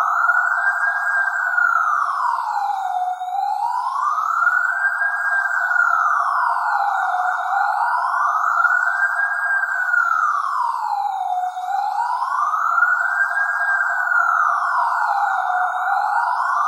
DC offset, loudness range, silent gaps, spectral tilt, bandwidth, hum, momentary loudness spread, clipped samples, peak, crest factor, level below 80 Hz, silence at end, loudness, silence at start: under 0.1%; 2 LU; none; 6.5 dB/octave; 15.5 kHz; none; 6 LU; under 0.1%; -6 dBFS; 14 dB; under -90 dBFS; 0 s; -19 LUFS; 0 s